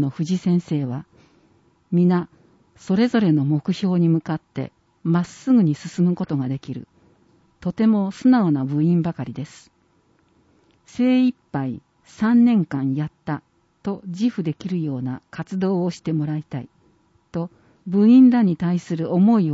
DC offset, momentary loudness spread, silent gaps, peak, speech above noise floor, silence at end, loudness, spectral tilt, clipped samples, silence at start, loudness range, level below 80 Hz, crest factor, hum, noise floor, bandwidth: under 0.1%; 16 LU; none; -6 dBFS; 42 dB; 0 s; -21 LUFS; -8.5 dB/octave; under 0.1%; 0 s; 6 LU; -62 dBFS; 16 dB; none; -61 dBFS; 8 kHz